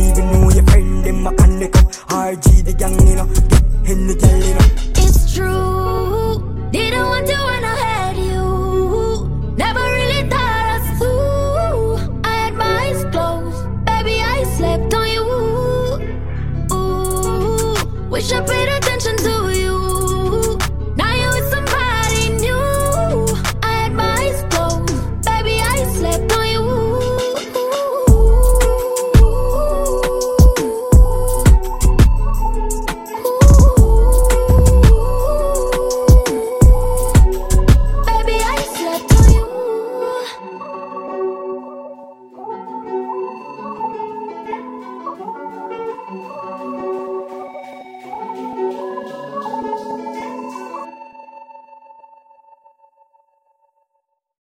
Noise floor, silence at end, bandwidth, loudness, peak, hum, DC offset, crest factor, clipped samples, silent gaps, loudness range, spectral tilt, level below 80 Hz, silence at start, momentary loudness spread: -70 dBFS; 0 s; 16.5 kHz; -16 LUFS; 0 dBFS; none; under 0.1%; 14 dB; under 0.1%; none; 14 LU; -5.5 dB/octave; -16 dBFS; 0 s; 15 LU